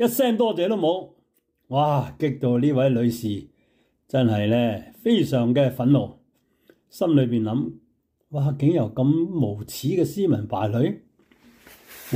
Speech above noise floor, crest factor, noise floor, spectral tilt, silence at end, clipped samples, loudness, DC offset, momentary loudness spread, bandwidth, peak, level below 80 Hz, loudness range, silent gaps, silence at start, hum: 47 dB; 14 dB; -68 dBFS; -7.5 dB/octave; 0 s; under 0.1%; -23 LUFS; under 0.1%; 8 LU; 16 kHz; -8 dBFS; -62 dBFS; 2 LU; none; 0 s; none